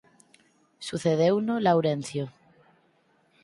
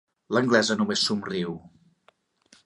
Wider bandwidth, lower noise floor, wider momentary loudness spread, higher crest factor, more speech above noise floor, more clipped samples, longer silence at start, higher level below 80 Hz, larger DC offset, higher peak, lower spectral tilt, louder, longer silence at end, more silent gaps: about the same, 11.5 kHz vs 11.5 kHz; about the same, -66 dBFS vs -64 dBFS; first, 14 LU vs 11 LU; about the same, 18 dB vs 22 dB; about the same, 41 dB vs 40 dB; neither; first, 0.8 s vs 0.3 s; about the same, -68 dBFS vs -66 dBFS; neither; second, -10 dBFS vs -6 dBFS; first, -6.5 dB/octave vs -4 dB/octave; about the same, -26 LUFS vs -24 LUFS; first, 1.15 s vs 0.95 s; neither